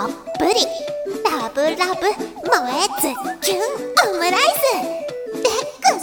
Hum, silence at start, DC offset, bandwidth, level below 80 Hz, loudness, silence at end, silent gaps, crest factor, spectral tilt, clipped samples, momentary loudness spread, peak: none; 0 s; under 0.1%; 18 kHz; -56 dBFS; -19 LUFS; 0 s; none; 18 dB; -1.5 dB/octave; under 0.1%; 10 LU; 0 dBFS